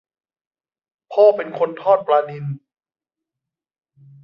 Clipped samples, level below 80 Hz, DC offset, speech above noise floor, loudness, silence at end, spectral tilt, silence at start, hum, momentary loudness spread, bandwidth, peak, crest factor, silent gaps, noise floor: under 0.1%; -74 dBFS; under 0.1%; 71 dB; -18 LUFS; 1.65 s; -8.5 dB/octave; 1.1 s; none; 15 LU; 5.6 kHz; -2 dBFS; 20 dB; none; -88 dBFS